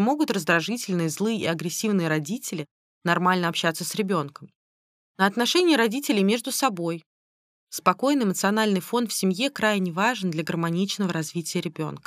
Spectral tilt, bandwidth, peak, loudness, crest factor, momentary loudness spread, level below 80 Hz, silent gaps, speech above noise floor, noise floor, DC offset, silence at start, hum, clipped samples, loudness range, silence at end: -4.5 dB/octave; 15.5 kHz; -6 dBFS; -24 LUFS; 20 dB; 9 LU; -72 dBFS; 2.71-3.01 s, 4.56-5.15 s, 7.06-7.67 s; over 66 dB; under -90 dBFS; under 0.1%; 0 s; none; under 0.1%; 2 LU; 0.1 s